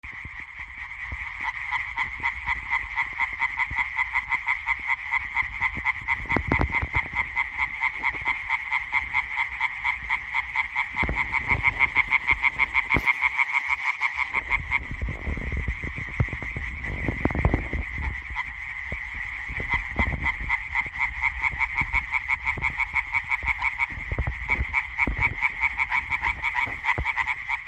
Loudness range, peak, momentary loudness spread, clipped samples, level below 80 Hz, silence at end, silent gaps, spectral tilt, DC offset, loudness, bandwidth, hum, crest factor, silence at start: 6 LU; -6 dBFS; 9 LU; under 0.1%; -38 dBFS; 0 s; none; -5.5 dB/octave; under 0.1%; -25 LUFS; 9.2 kHz; none; 20 dB; 0.05 s